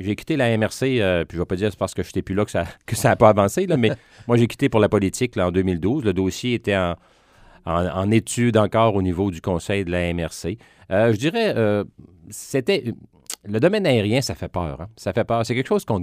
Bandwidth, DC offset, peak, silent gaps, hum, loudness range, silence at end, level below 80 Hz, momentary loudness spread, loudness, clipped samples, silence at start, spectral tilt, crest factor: 15.5 kHz; under 0.1%; 0 dBFS; none; none; 4 LU; 0 s; -46 dBFS; 10 LU; -21 LUFS; under 0.1%; 0 s; -6 dB/octave; 20 dB